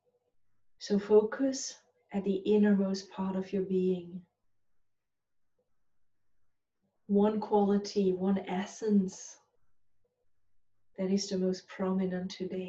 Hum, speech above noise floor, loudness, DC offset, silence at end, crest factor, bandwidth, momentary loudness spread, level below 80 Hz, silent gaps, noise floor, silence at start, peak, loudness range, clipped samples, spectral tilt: none; 52 dB; -31 LUFS; under 0.1%; 0 s; 18 dB; 7.8 kHz; 12 LU; -74 dBFS; none; -82 dBFS; 0.8 s; -14 dBFS; 7 LU; under 0.1%; -6.5 dB/octave